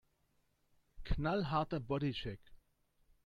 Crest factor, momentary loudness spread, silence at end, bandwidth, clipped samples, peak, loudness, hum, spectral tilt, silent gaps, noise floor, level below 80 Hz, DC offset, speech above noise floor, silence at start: 18 dB; 15 LU; 0.7 s; 7.2 kHz; under 0.1%; -22 dBFS; -38 LUFS; none; -8 dB/octave; none; -77 dBFS; -50 dBFS; under 0.1%; 40 dB; 0.95 s